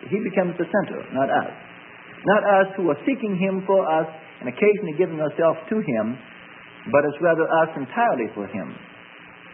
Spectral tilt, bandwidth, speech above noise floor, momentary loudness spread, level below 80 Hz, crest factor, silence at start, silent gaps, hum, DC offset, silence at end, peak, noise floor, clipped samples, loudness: -11.5 dB/octave; 3.5 kHz; 23 dB; 22 LU; -70 dBFS; 18 dB; 0 s; none; none; under 0.1%; 0 s; -4 dBFS; -44 dBFS; under 0.1%; -22 LUFS